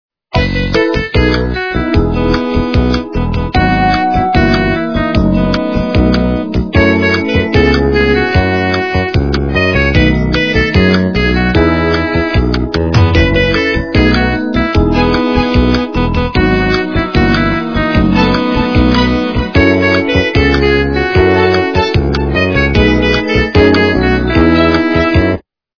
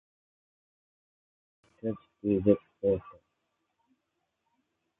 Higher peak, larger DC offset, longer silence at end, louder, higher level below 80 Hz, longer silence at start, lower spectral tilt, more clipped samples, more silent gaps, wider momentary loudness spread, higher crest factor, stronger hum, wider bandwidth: first, 0 dBFS vs -10 dBFS; neither; second, 0.4 s vs 1.9 s; first, -11 LUFS vs -30 LUFS; first, -20 dBFS vs -60 dBFS; second, 0.35 s vs 1.85 s; second, -7 dB/octave vs -11.5 dB/octave; first, 0.2% vs under 0.1%; neither; second, 4 LU vs 11 LU; second, 10 dB vs 26 dB; neither; first, 5.4 kHz vs 3.8 kHz